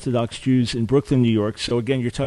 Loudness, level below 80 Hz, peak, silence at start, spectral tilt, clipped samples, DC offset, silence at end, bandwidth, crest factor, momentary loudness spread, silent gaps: -21 LUFS; -44 dBFS; -6 dBFS; 0 s; -6.5 dB/octave; under 0.1%; under 0.1%; 0 s; 11.5 kHz; 14 dB; 5 LU; none